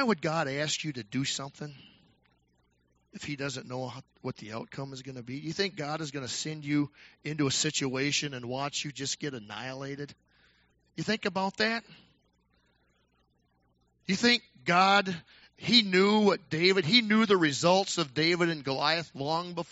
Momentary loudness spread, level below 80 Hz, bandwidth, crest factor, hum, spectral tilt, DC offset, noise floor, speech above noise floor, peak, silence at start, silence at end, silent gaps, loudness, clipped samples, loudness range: 17 LU; -70 dBFS; 8 kHz; 22 dB; 60 Hz at -65 dBFS; -3 dB/octave; under 0.1%; -71 dBFS; 42 dB; -8 dBFS; 0 s; 0.05 s; none; -28 LUFS; under 0.1%; 13 LU